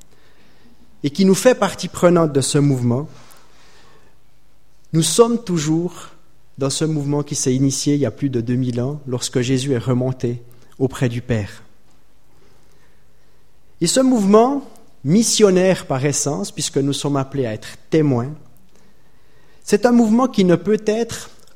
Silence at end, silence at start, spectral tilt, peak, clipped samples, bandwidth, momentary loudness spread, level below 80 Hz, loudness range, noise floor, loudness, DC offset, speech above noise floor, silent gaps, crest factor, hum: 0.3 s; 1.05 s; -5 dB/octave; 0 dBFS; under 0.1%; 16.5 kHz; 12 LU; -50 dBFS; 6 LU; -57 dBFS; -18 LUFS; 1%; 40 dB; none; 18 dB; none